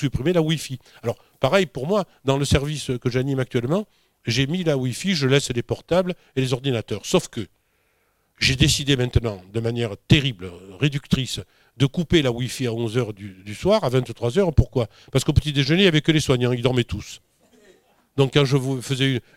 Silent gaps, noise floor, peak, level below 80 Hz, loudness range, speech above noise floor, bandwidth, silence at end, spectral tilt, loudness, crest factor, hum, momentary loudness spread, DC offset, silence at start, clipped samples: none; -66 dBFS; -4 dBFS; -38 dBFS; 3 LU; 45 dB; 15.5 kHz; 0.15 s; -5.5 dB/octave; -22 LUFS; 18 dB; none; 11 LU; under 0.1%; 0 s; under 0.1%